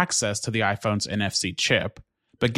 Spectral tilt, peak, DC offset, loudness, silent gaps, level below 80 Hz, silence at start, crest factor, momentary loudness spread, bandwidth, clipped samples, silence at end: -3.5 dB/octave; -6 dBFS; under 0.1%; -24 LUFS; none; -56 dBFS; 0 s; 20 dB; 4 LU; 14.5 kHz; under 0.1%; 0 s